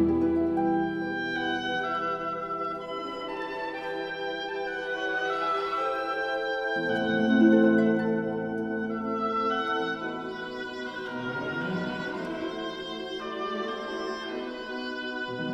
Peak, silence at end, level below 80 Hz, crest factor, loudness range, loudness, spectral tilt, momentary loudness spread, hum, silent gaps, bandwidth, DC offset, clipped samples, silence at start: -10 dBFS; 0 s; -60 dBFS; 20 dB; 8 LU; -29 LUFS; -6 dB/octave; 10 LU; none; none; 8.4 kHz; under 0.1%; under 0.1%; 0 s